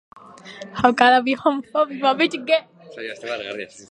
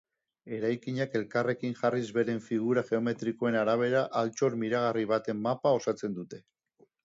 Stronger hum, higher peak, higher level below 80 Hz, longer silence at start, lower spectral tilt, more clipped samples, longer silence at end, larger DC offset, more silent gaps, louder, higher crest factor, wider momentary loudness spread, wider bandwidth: neither; first, 0 dBFS vs -14 dBFS; first, -60 dBFS vs -74 dBFS; about the same, 0.45 s vs 0.45 s; second, -4 dB/octave vs -6.5 dB/octave; neither; second, 0.1 s vs 0.65 s; neither; neither; first, -19 LUFS vs -30 LUFS; about the same, 20 dB vs 16 dB; first, 18 LU vs 7 LU; first, 10.5 kHz vs 7.8 kHz